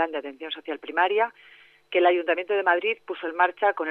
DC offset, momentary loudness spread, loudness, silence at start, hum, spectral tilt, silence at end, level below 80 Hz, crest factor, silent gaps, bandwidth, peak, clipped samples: under 0.1%; 12 LU; -25 LUFS; 0 s; none; -5 dB/octave; 0 s; -84 dBFS; 18 dB; none; 4.3 kHz; -6 dBFS; under 0.1%